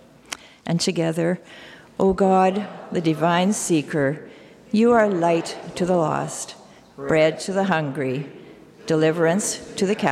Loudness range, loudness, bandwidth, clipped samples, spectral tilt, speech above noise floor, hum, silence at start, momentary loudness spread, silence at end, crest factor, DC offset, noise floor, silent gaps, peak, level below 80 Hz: 3 LU; -21 LUFS; 15 kHz; under 0.1%; -5 dB/octave; 21 dB; none; 0.3 s; 17 LU; 0 s; 16 dB; under 0.1%; -42 dBFS; none; -6 dBFS; -54 dBFS